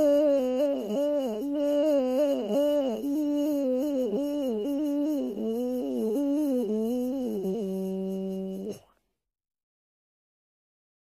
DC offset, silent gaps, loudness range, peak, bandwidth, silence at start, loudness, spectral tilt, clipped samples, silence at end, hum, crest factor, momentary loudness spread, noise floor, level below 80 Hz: under 0.1%; none; 8 LU; -16 dBFS; 15.5 kHz; 0 s; -28 LUFS; -7 dB/octave; under 0.1%; 2.2 s; none; 12 dB; 7 LU; -70 dBFS; -66 dBFS